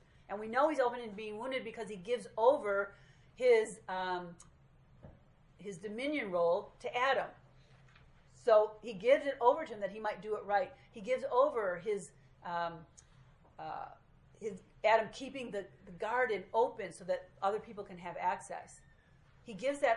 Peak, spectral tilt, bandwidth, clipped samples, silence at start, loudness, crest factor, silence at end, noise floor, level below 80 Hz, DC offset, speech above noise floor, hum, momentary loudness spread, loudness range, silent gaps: -14 dBFS; -4.5 dB/octave; 11 kHz; under 0.1%; 0.3 s; -35 LUFS; 22 dB; 0 s; -64 dBFS; -68 dBFS; under 0.1%; 29 dB; none; 17 LU; 5 LU; none